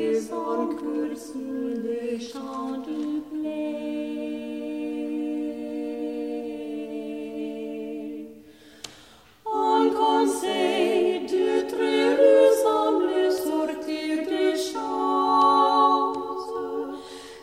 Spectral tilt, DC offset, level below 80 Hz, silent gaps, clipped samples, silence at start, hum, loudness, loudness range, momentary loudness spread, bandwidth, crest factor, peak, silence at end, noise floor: -3.5 dB/octave; under 0.1%; -66 dBFS; none; under 0.1%; 0 s; 60 Hz at -70 dBFS; -25 LUFS; 11 LU; 15 LU; 16 kHz; 18 dB; -6 dBFS; 0 s; -52 dBFS